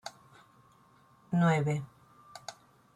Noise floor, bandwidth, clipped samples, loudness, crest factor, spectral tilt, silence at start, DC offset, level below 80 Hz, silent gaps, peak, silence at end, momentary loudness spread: -63 dBFS; 11 kHz; under 0.1%; -30 LUFS; 18 dB; -7 dB/octave; 0.05 s; under 0.1%; -70 dBFS; none; -16 dBFS; 0.45 s; 22 LU